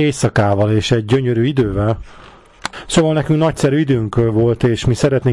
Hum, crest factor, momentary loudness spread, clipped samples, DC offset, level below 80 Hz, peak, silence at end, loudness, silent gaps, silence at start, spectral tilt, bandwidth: none; 10 dB; 5 LU; under 0.1%; under 0.1%; -36 dBFS; -4 dBFS; 0 s; -15 LUFS; none; 0 s; -6.5 dB/octave; 12 kHz